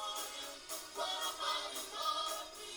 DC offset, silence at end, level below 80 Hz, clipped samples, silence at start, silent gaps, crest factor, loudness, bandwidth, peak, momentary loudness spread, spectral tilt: under 0.1%; 0 s; -72 dBFS; under 0.1%; 0 s; none; 16 dB; -39 LUFS; over 20 kHz; -26 dBFS; 7 LU; 1 dB/octave